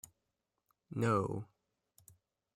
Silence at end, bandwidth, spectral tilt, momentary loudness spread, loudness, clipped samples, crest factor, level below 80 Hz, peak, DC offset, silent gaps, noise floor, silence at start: 1.1 s; 16 kHz; -7 dB/octave; 23 LU; -36 LUFS; under 0.1%; 20 dB; -72 dBFS; -20 dBFS; under 0.1%; none; -87 dBFS; 0.9 s